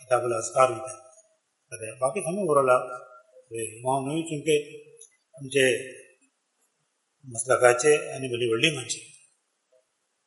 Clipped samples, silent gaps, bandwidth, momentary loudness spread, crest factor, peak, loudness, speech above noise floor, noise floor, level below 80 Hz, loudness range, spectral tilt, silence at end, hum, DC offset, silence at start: under 0.1%; none; 11.5 kHz; 19 LU; 24 dB; -4 dBFS; -25 LUFS; 50 dB; -75 dBFS; -74 dBFS; 3 LU; -3.5 dB/octave; 1.2 s; none; under 0.1%; 0 s